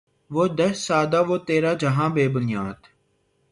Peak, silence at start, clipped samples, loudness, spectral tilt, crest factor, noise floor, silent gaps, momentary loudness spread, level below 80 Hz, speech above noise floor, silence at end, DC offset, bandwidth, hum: -8 dBFS; 0.3 s; under 0.1%; -22 LUFS; -6 dB/octave; 16 dB; -67 dBFS; none; 7 LU; -58 dBFS; 45 dB; 0.75 s; under 0.1%; 11.5 kHz; none